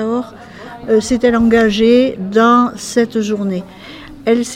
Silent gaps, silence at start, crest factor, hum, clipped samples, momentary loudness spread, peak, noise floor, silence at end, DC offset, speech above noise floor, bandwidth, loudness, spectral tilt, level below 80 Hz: none; 0 s; 14 dB; none; under 0.1%; 22 LU; 0 dBFS; -33 dBFS; 0 s; under 0.1%; 20 dB; 13 kHz; -14 LUFS; -5 dB/octave; -42 dBFS